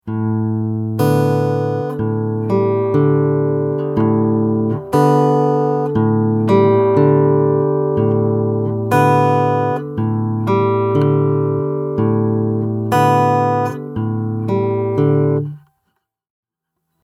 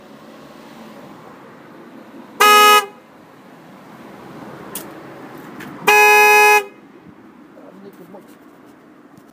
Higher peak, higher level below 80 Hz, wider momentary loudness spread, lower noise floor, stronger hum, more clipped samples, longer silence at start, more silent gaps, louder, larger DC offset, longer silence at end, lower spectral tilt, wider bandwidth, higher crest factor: about the same, 0 dBFS vs 0 dBFS; first, -52 dBFS vs -70 dBFS; second, 7 LU vs 28 LU; first, -76 dBFS vs -45 dBFS; neither; neither; second, 0.05 s vs 2.4 s; neither; second, -16 LUFS vs -10 LUFS; neither; second, 1.45 s vs 2.65 s; first, -9 dB/octave vs -0.5 dB/octave; second, 14.5 kHz vs 16 kHz; about the same, 16 dB vs 18 dB